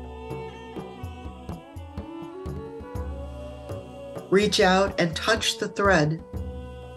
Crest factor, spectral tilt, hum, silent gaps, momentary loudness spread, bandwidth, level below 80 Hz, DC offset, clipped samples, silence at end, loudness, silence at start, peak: 20 dB; -4.5 dB/octave; none; none; 19 LU; 13 kHz; -42 dBFS; under 0.1%; under 0.1%; 0 s; -24 LUFS; 0 s; -6 dBFS